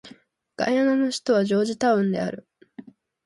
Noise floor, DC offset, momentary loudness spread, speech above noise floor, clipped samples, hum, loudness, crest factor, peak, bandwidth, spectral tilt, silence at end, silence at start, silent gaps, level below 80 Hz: -52 dBFS; under 0.1%; 8 LU; 30 dB; under 0.1%; none; -23 LUFS; 16 dB; -8 dBFS; 11.5 kHz; -5.5 dB/octave; 0.45 s; 0.05 s; none; -68 dBFS